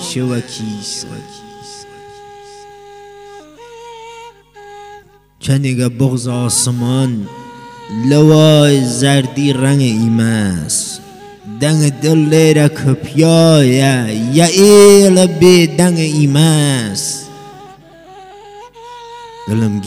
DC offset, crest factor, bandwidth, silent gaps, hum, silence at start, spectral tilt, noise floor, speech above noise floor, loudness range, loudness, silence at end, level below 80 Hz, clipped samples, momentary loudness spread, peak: under 0.1%; 12 dB; 16 kHz; none; 50 Hz at -35 dBFS; 0 s; -5.5 dB/octave; -41 dBFS; 30 dB; 14 LU; -11 LUFS; 0 s; -50 dBFS; 0.5%; 25 LU; 0 dBFS